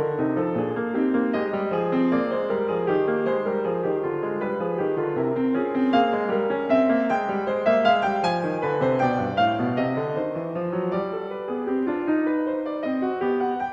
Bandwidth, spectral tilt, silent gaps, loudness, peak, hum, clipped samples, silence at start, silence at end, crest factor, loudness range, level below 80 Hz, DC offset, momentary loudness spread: 7.4 kHz; -8 dB/octave; none; -24 LUFS; -8 dBFS; none; under 0.1%; 0 s; 0 s; 16 dB; 4 LU; -62 dBFS; under 0.1%; 6 LU